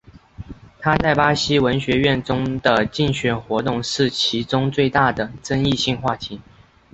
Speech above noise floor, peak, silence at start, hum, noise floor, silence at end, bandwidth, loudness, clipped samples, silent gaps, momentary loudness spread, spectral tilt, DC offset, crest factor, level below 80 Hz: 20 dB; -2 dBFS; 0.4 s; none; -39 dBFS; 0.55 s; 8.2 kHz; -19 LUFS; under 0.1%; none; 10 LU; -5 dB/octave; under 0.1%; 18 dB; -42 dBFS